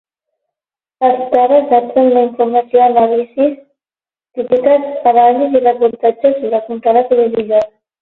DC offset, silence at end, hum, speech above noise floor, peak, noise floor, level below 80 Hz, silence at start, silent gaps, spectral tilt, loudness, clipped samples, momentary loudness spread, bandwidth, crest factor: under 0.1%; 0.35 s; none; over 79 dB; 0 dBFS; under -90 dBFS; -60 dBFS; 1 s; none; -8 dB/octave; -12 LUFS; under 0.1%; 6 LU; 4.2 kHz; 12 dB